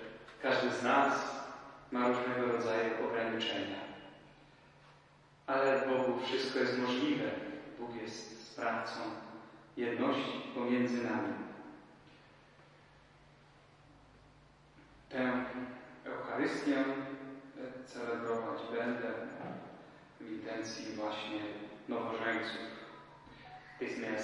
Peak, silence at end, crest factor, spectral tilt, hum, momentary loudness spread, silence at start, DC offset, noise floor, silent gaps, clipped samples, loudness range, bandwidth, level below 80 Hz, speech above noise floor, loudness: -16 dBFS; 0 s; 22 dB; -4.5 dB/octave; none; 17 LU; 0 s; under 0.1%; -63 dBFS; none; under 0.1%; 7 LU; 11 kHz; -74 dBFS; 28 dB; -36 LUFS